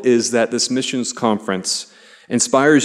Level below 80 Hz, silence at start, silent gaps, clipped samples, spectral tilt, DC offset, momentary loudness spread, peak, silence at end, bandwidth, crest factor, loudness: -66 dBFS; 0 s; none; under 0.1%; -3 dB/octave; under 0.1%; 9 LU; -2 dBFS; 0 s; 13 kHz; 14 dB; -18 LUFS